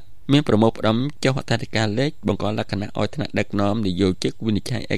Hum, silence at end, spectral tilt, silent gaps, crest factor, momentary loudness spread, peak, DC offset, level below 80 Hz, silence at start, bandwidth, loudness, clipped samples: none; 0 s; -6 dB/octave; none; 18 dB; 7 LU; -4 dBFS; 3%; -48 dBFS; 0.05 s; 13 kHz; -22 LUFS; under 0.1%